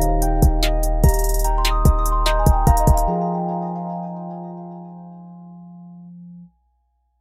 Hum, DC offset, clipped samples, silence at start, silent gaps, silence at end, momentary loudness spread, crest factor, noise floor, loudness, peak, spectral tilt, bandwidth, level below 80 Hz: none; under 0.1%; under 0.1%; 0 s; none; 0.75 s; 23 LU; 14 dB; -66 dBFS; -20 LUFS; -4 dBFS; -5.5 dB/octave; 16 kHz; -20 dBFS